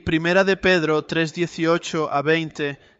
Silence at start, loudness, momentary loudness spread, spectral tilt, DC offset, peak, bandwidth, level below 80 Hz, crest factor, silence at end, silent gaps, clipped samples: 0.05 s; -20 LUFS; 6 LU; -5.5 dB/octave; under 0.1%; -6 dBFS; 8 kHz; -50 dBFS; 16 dB; 0.25 s; none; under 0.1%